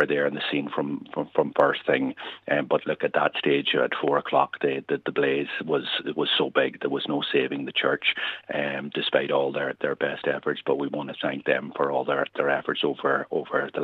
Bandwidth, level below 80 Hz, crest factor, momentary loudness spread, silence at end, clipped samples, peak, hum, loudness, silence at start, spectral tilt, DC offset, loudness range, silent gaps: 5.2 kHz; -72 dBFS; 20 dB; 6 LU; 0 s; under 0.1%; -6 dBFS; none; -25 LUFS; 0 s; -7 dB/octave; under 0.1%; 2 LU; none